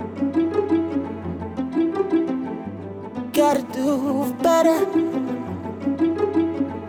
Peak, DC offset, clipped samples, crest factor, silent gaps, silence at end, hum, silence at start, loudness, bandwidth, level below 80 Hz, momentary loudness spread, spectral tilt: -6 dBFS; under 0.1%; under 0.1%; 16 dB; none; 0 s; none; 0 s; -22 LUFS; over 20 kHz; -56 dBFS; 12 LU; -6 dB/octave